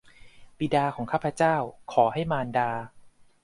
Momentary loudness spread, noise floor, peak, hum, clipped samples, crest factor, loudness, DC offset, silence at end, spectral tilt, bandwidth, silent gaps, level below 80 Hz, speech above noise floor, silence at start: 8 LU; -49 dBFS; -8 dBFS; none; under 0.1%; 20 dB; -27 LUFS; under 0.1%; 0.35 s; -6.5 dB/octave; 11.5 kHz; none; -58 dBFS; 23 dB; 0.25 s